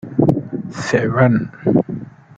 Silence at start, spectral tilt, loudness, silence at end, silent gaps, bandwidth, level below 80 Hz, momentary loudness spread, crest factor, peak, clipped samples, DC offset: 0.05 s; -7.5 dB/octave; -18 LUFS; 0.3 s; none; 8.8 kHz; -48 dBFS; 12 LU; 16 dB; 0 dBFS; under 0.1%; under 0.1%